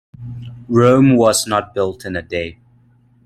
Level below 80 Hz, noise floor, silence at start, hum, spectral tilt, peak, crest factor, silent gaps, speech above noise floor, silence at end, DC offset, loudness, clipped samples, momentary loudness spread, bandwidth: -50 dBFS; -52 dBFS; 0.2 s; none; -5.5 dB/octave; 0 dBFS; 16 dB; none; 37 dB; 0.75 s; under 0.1%; -15 LUFS; under 0.1%; 21 LU; 15 kHz